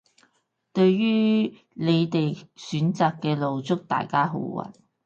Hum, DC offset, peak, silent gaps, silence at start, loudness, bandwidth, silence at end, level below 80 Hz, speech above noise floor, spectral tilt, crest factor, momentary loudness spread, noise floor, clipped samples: none; under 0.1%; -8 dBFS; none; 0.75 s; -24 LUFS; 7.6 kHz; 0.35 s; -68 dBFS; 47 dB; -7.5 dB/octave; 18 dB; 11 LU; -70 dBFS; under 0.1%